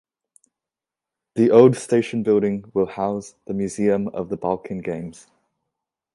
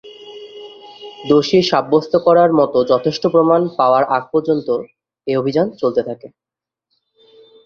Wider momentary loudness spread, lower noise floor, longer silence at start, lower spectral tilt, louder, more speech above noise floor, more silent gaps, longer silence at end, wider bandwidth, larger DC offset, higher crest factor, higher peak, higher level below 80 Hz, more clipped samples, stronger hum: second, 16 LU vs 23 LU; first, -88 dBFS vs -73 dBFS; first, 1.35 s vs 0.05 s; about the same, -7 dB/octave vs -6.5 dB/octave; second, -21 LUFS vs -15 LUFS; first, 68 dB vs 58 dB; neither; second, 1 s vs 1.4 s; first, 11.5 kHz vs 7 kHz; neither; about the same, 20 dB vs 16 dB; about the same, 0 dBFS vs 0 dBFS; about the same, -58 dBFS vs -58 dBFS; neither; neither